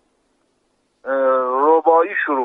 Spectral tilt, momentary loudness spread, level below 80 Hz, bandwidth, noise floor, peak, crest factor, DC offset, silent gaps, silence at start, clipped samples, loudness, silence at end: -6 dB/octave; 9 LU; -74 dBFS; 3.9 kHz; -66 dBFS; -2 dBFS; 16 dB; under 0.1%; none; 1.05 s; under 0.1%; -16 LUFS; 0 s